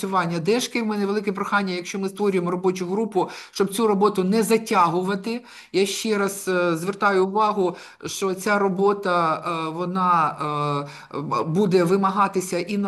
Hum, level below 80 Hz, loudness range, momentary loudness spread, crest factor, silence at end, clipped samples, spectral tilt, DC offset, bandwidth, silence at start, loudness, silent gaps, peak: none; -70 dBFS; 2 LU; 8 LU; 16 dB; 0 s; under 0.1%; -5 dB/octave; under 0.1%; 12.5 kHz; 0 s; -22 LUFS; none; -6 dBFS